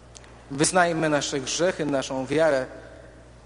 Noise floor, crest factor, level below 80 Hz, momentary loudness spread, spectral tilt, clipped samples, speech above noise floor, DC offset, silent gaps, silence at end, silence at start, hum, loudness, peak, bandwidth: -47 dBFS; 20 dB; -52 dBFS; 12 LU; -3.5 dB/octave; under 0.1%; 23 dB; under 0.1%; none; 0.25 s; 0.1 s; none; -24 LUFS; -4 dBFS; 10.5 kHz